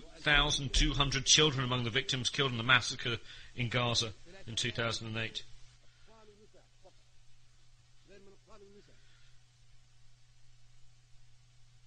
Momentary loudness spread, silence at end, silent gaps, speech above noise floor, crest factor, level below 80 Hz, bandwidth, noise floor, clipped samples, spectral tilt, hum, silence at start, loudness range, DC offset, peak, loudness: 15 LU; 0.25 s; none; 28 dB; 26 dB; -46 dBFS; 9.8 kHz; -59 dBFS; under 0.1%; -2.5 dB/octave; none; 0 s; 14 LU; under 0.1%; -10 dBFS; -30 LUFS